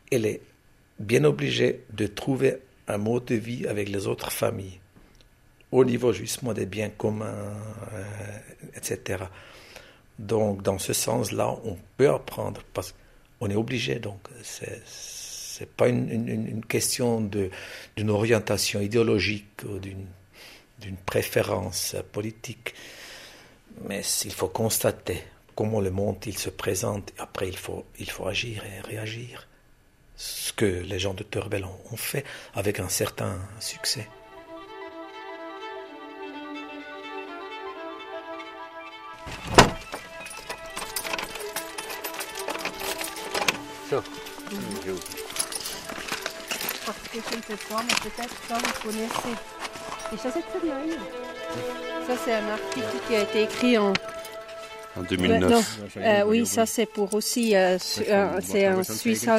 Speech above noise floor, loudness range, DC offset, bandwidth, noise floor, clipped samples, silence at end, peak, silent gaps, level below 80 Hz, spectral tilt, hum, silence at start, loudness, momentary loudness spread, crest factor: 31 dB; 9 LU; under 0.1%; 15.5 kHz; -58 dBFS; under 0.1%; 0 s; 0 dBFS; none; -52 dBFS; -4 dB/octave; none; 0.1 s; -27 LUFS; 16 LU; 28 dB